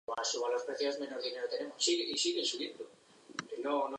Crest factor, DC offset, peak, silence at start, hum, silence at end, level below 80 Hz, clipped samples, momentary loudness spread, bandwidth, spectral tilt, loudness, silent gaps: 18 dB; under 0.1%; -18 dBFS; 0.1 s; none; 0 s; -86 dBFS; under 0.1%; 13 LU; 10.5 kHz; -1 dB/octave; -35 LUFS; none